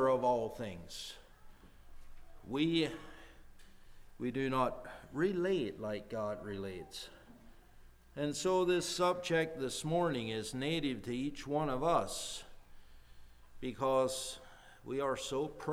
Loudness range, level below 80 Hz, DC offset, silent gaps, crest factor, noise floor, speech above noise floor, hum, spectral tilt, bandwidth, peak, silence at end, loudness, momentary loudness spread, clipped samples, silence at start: 6 LU; -58 dBFS; under 0.1%; none; 20 dB; -58 dBFS; 23 dB; none; -4.5 dB/octave; 18.5 kHz; -18 dBFS; 0 s; -36 LUFS; 15 LU; under 0.1%; 0 s